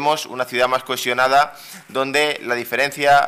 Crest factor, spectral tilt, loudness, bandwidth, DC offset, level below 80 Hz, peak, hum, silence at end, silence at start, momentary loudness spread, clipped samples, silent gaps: 14 dB; -2.5 dB/octave; -19 LUFS; 16 kHz; under 0.1%; -58 dBFS; -6 dBFS; none; 0 s; 0 s; 8 LU; under 0.1%; none